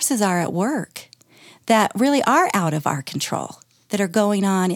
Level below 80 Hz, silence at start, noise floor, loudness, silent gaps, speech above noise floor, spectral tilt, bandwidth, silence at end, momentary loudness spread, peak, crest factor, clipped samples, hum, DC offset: -72 dBFS; 0 s; -50 dBFS; -20 LUFS; none; 30 dB; -4.5 dB/octave; 18.5 kHz; 0 s; 12 LU; -4 dBFS; 16 dB; under 0.1%; none; under 0.1%